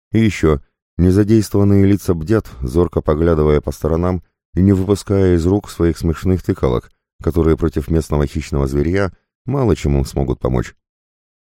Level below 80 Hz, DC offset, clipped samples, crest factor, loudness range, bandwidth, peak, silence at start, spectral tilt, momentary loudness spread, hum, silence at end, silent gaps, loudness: -28 dBFS; under 0.1%; under 0.1%; 16 dB; 3 LU; 16 kHz; 0 dBFS; 0.15 s; -8 dB/octave; 8 LU; none; 0.8 s; 0.82-0.97 s, 4.45-4.53 s, 7.13-7.19 s, 9.35-9.45 s; -17 LUFS